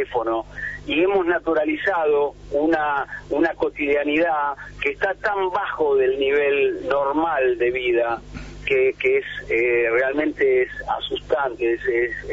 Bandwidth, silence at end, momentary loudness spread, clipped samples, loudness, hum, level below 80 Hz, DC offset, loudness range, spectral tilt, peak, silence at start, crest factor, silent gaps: 7.6 kHz; 0 s; 7 LU; under 0.1%; -21 LUFS; 50 Hz at -50 dBFS; -46 dBFS; under 0.1%; 1 LU; -6 dB/octave; -6 dBFS; 0 s; 14 dB; none